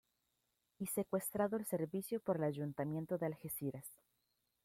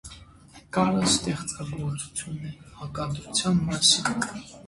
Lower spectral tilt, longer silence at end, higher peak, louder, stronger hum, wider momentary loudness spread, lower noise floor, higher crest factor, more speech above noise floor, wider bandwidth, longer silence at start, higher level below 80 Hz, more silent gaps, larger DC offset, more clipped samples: first, -6.5 dB/octave vs -3.5 dB/octave; first, 0.7 s vs 0 s; second, -24 dBFS vs -6 dBFS; second, -41 LUFS vs -25 LUFS; neither; second, 7 LU vs 18 LU; first, -85 dBFS vs -51 dBFS; about the same, 18 dB vs 20 dB; first, 44 dB vs 24 dB; first, 16.5 kHz vs 11.5 kHz; first, 0.8 s vs 0.05 s; second, -78 dBFS vs -50 dBFS; neither; neither; neither